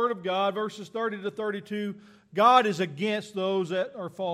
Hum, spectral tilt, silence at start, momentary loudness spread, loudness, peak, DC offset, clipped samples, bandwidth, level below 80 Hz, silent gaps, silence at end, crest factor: none; -5.5 dB/octave; 0 s; 14 LU; -27 LUFS; -6 dBFS; under 0.1%; under 0.1%; 14 kHz; -78 dBFS; none; 0 s; 20 dB